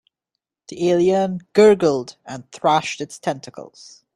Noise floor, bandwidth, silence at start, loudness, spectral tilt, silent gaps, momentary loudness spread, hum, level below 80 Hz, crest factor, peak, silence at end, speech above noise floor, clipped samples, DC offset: -82 dBFS; 11 kHz; 0.7 s; -18 LUFS; -5.5 dB/octave; none; 23 LU; none; -62 dBFS; 18 dB; -2 dBFS; 0.5 s; 63 dB; under 0.1%; under 0.1%